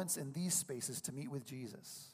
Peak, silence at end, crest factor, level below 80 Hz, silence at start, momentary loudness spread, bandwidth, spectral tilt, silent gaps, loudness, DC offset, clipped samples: -22 dBFS; 0 s; 20 dB; -82 dBFS; 0 s; 12 LU; 15.5 kHz; -3.5 dB/octave; none; -41 LUFS; under 0.1%; under 0.1%